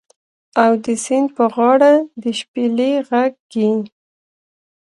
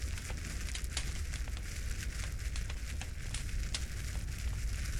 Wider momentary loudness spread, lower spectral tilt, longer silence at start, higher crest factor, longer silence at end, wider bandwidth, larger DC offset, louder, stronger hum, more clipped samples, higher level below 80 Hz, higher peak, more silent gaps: first, 11 LU vs 3 LU; about the same, -4.5 dB/octave vs -3.5 dB/octave; first, 0.55 s vs 0 s; about the same, 16 dB vs 18 dB; first, 1 s vs 0 s; second, 11.5 kHz vs 16.5 kHz; neither; first, -16 LUFS vs -40 LUFS; neither; neither; second, -68 dBFS vs -40 dBFS; first, 0 dBFS vs -20 dBFS; first, 2.48-2.54 s, 3.40-3.49 s vs none